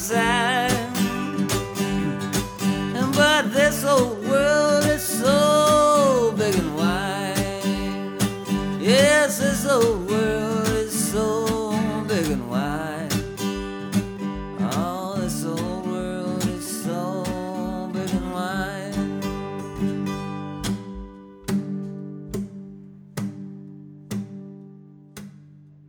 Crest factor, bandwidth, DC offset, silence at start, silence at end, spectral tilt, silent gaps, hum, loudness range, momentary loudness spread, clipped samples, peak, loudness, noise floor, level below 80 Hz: 18 dB; over 20 kHz; under 0.1%; 0 s; 0.3 s; -4.5 dB/octave; none; none; 13 LU; 15 LU; under 0.1%; -4 dBFS; -23 LUFS; -48 dBFS; -44 dBFS